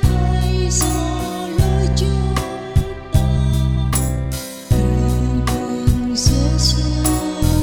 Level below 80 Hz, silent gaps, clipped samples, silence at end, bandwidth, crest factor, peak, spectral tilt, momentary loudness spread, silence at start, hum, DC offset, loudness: -22 dBFS; none; under 0.1%; 0 s; 18 kHz; 16 dB; -2 dBFS; -5.5 dB/octave; 5 LU; 0 s; none; under 0.1%; -18 LUFS